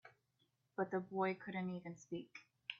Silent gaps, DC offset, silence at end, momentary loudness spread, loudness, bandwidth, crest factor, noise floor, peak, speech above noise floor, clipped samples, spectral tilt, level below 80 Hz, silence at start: none; under 0.1%; 0 s; 11 LU; -44 LUFS; 7.2 kHz; 20 dB; -82 dBFS; -26 dBFS; 39 dB; under 0.1%; -4.5 dB/octave; -86 dBFS; 0.05 s